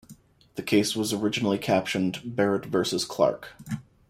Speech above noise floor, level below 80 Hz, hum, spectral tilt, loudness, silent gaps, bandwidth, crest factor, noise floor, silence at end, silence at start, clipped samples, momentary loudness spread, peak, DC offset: 27 dB; -62 dBFS; none; -4.5 dB/octave; -26 LUFS; none; 16 kHz; 20 dB; -53 dBFS; 0.3 s; 0.1 s; under 0.1%; 13 LU; -8 dBFS; under 0.1%